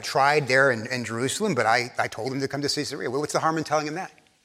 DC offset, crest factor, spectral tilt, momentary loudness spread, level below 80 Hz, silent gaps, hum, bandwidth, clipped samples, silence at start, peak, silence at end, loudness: under 0.1%; 18 dB; -4 dB/octave; 9 LU; -68 dBFS; none; none; 16 kHz; under 0.1%; 0 s; -6 dBFS; 0.35 s; -24 LUFS